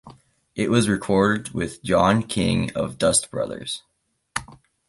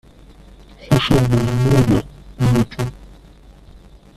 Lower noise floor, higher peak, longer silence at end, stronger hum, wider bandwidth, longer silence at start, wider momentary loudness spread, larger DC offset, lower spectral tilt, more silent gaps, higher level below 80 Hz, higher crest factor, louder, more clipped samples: first, -49 dBFS vs -44 dBFS; about the same, -4 dBFS vs -2 dBFS; second, 0.35 s vs 1.1 s; neither; second, 12 kHz vs 14 kHz; second, 0.05 s vs 0.8 s; about the same, 13 LU vs 11 LU; neither; second, -4.5 dB/octave vs -7 dB/octave; neither; second, -46 dBFS vs -34 dBFS; about the same, 20 dB vs 16 dB; second, -22 LUFS vs -17 LUFS; neither